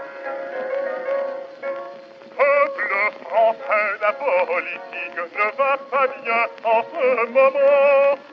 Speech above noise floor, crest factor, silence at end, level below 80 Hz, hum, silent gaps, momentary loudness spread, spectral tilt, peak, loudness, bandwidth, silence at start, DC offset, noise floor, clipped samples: 20 dB; 16 dB; 0 s; -88 dBFS; none; none; 14 LU; -4.5 dB/octave; -4 dBFS; -20 LUFS; 5.8 kHz; 0 s; under 0.1%; -40 dBFS; under 0.1%